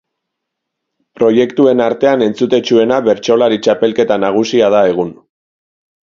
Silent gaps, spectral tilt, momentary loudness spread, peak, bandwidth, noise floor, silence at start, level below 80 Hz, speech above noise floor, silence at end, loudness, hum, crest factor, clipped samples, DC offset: none; -5.5 dB/octave; 3 LU; 0 dBFS; 7.4 kHz; -76 dBFS; 1.2 s; -56 dBFS; 65 dB; 0.9 s; -12 LUFS; none; 12 dB; under 0.1%; under 0.1%